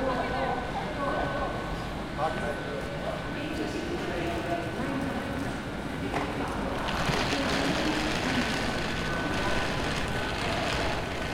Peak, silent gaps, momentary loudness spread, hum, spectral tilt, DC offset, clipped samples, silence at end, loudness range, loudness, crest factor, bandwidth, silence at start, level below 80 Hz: -14 dBFS; none; 6 LU; none; -5 dB/octave; under 0.1%; under 0.1%; 0 s; 4 LU; -30 LUFS; 16 dB; 16.5 kHz; 0 s; -42 dBFS